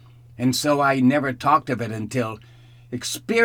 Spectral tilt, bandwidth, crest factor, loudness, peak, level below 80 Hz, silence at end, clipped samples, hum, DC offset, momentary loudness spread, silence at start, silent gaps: -5 dB/octave; 19.5 kHz; 16 dB; -22 LUFS; -6 dBFS; -58 dBFS; 0 s; under 0.1%; none; under 0.1%; 12 LU; 0.4 s; none